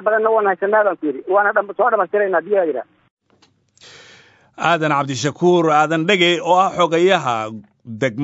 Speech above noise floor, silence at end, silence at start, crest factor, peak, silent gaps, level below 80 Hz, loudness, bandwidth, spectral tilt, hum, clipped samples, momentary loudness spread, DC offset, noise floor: 41 dB; 0 s; 0 s; 18 dB; 0 dBFS; 3.11-3.17 s; -66 dBFS; -17 LUFS; 8 kHz; -5 dB/octave; none; under 0.1%; 9 LU; under 0.1%; -58 dBFS